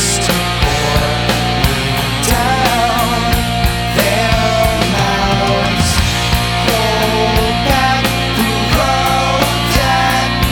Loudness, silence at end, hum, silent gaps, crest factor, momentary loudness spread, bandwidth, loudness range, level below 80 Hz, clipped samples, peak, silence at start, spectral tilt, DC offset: -13 LUFS; 0 s; none; none; 14 dB; 2 LU; over 20 kHz; 1 LU; -22 dBFS; under 0.1%; 0 dBFS; 0 s; -4 dB/octave; under 0.1%